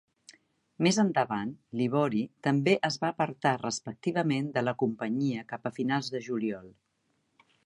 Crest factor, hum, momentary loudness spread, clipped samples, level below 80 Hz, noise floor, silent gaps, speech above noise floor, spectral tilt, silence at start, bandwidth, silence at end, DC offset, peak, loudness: 20 dB; none; 9 LU; under 0.1%; -74 dBFS; -75 dBFS; none; 46 dB; -5.5 dB/octave; 0.8 s; 11.5 kHz; 0.95 s; under 0.1%; -10 dBFS; -30 LUFS